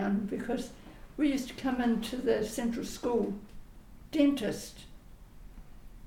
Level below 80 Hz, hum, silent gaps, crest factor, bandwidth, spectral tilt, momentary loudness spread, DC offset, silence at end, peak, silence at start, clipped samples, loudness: -52 dBFS; none; none; 18 dB; 17.5 kHz; -5.5 dB/octave; 17 LU; under 0.1%; 0 s; -14 dBFS; 0 s; under 0.1%; -32 LUFS